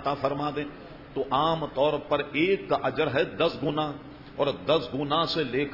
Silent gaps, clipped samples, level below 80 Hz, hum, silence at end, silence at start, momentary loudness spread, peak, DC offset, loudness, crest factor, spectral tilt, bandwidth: none; under 0.1%; -54 dBFS; none; 0 s; 0 s; 10 LU; -10 dBFS; under 0.1%; -27 LUFS; 16 dB; -7 dB/octave; 5.8 kHz